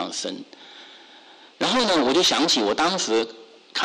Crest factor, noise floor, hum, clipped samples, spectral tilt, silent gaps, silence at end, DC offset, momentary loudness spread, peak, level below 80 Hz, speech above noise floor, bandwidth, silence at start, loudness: 12 dB; -49 dBFS; none; under 0.1%; -2 dB/octave; none; 0 s; under 0.1%; 21 LU; -12 dBFS; -62 dBFS; 27 dB; 13.5 kHz; 0 s; -21 LUFS